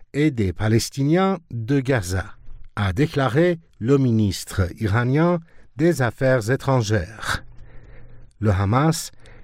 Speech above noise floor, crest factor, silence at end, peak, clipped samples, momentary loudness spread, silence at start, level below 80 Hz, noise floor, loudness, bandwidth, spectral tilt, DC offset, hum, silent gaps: 20 dB; 16 dB; 0 s; -6 dBFS; under 0.1%; 8 LU; 0 s; -44 dBFS; -40 dBFS; -21 LUFS; 16 kHz; -6.5 dB/octave; under 0.1%; none; none